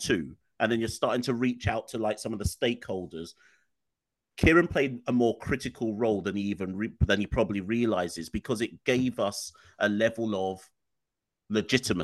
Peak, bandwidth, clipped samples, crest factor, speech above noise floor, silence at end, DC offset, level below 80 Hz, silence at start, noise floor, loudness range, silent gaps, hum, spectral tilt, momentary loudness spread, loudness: -6 dBFS; 12.5 kHz; under 0.1%; 22 dB; 58 dB; 0 s; under 0.1%; -46 dBFS; 0 s; -87 dBFS; 3 LU; none; none; -5.5 dB/octave; 9 LU; -28 LUFS